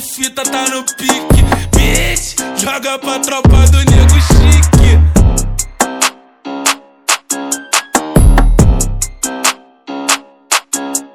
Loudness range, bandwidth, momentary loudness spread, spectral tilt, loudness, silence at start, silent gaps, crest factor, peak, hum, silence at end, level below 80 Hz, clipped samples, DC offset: 4 LU; 17 kHz; 9 LU; -4 dB/octave; -12 LUFS; 0 s; none; 10 dB; 0 dBFS; none; 0.1 s; -14 dBFS; 1%; under 0.1%